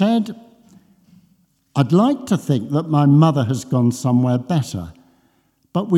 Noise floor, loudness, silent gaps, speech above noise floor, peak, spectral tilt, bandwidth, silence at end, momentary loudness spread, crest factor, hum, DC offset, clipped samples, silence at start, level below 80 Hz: -61 dBFS; -18 LUFS; none; 45 dB; -2 dBFS; -7.5 dB/octave; 13.5 kHz; 0 s; 14 LU; 16 dB; none; under 0.1%; under 0.1%; 0 s; -60 dBFS